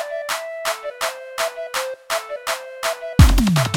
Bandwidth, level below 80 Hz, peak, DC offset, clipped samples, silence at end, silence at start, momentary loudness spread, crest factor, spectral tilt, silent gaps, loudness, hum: 18.5 kHz; -24 dBFS; 0 dBFS; under 0.1%; under 0.1%; 0 s; 0 s; 11 LU; 20 dB; -5 dB/octave; none; -21 LUFS; none